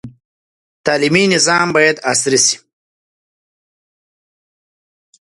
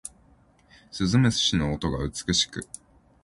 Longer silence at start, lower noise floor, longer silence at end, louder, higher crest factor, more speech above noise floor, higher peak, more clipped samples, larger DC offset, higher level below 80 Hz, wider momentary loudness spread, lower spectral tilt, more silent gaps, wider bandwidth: about the same, 0.05 s vs 0.05 s; first, under -90 dBFS vs -59 dBFS; first, 2.65 s vs 0.6 s; first, -13 LUFS vs -24 LUFS; about the same, 18 dB vs 18 dB; first, over 77 dB vs 34 dB; first, 0 dBFS vs -10 dBFS; neither; neither; second, -58 dBFS vs -44 dBFS; second, 7 LU vs 20 LU; second, -2.5 dB/octave vs -4 dB/octave; first, 0.25-0.84 s vs none; about the same, 11.5 kHz vs 11.5 kHz